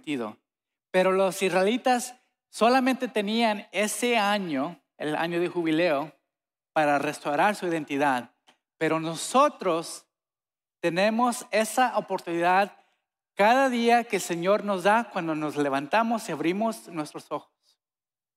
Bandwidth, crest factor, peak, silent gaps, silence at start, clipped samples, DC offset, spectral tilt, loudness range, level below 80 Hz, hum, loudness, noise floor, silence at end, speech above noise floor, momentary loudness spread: 16 kHz; 18 dB; -10 dBFS; none; 0.05 s; under 0.1%; under 0.1%; -4 dB/octave; 3 LU; -82 dBFS; none; -25 LUFS; under -90 dBFS; 0.95 s; over 65 dB; 11 LU